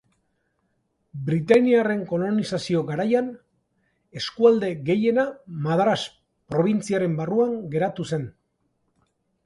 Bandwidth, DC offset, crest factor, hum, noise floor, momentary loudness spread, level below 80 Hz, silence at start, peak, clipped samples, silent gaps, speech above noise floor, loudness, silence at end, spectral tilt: 11.5 kHz; under 0.1%; 20 dB; none; -72 dBFS; 13 LU; -62 dBFS; 1.15 s; -4 dBFS; under 0.1%; none; 50 dB; -23 LUFS; 1.15 s; -6.5 dB/octave